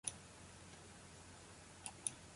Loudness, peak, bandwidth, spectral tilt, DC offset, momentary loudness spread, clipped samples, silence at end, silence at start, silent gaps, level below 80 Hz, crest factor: -52 LUFS; -20 dBFS; 11.5 kHz; -2 dB/octave; under 0.1%; 12 LU; under 0.1%; 0 s; 0.05 s; none; -70 dBFS; 32 dB